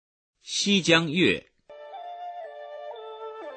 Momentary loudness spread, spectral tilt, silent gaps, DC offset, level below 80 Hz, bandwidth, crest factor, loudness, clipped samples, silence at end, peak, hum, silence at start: 20 LU; -3.5 dB/octave; none; under 0.1%; -64 dBFS; 9 kHz; 22 dB; -23 LUFS; under 0.1%; 0 s; -6 dBFS; none; 0.45 s